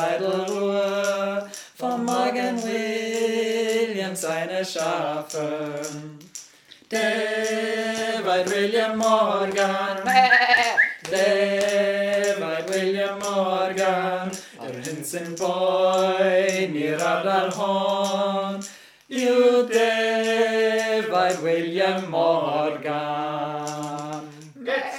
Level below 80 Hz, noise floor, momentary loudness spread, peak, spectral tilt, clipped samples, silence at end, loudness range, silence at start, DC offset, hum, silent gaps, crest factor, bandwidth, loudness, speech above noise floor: -74 dBFS; -49 dBFS; 11 LU; -4 dBFS; -3.5 dB/octave; under 0.1%; 0 s; 6 LU; 0 s; under 0.1%; none; none; 20 dB; 17.5 kHz; -22 LUFS; 27 dB